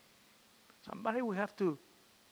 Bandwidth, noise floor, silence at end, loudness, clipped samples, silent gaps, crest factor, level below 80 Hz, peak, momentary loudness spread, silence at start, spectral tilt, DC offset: over 20 kHz; -65 dBFS; 0.55 s; -37 LUFS; under 0.1%; none; 20 dB; -84 dBFS; -20 dBFS; 14 LU; 0.85 s; -7 dB/octave; under 0.1%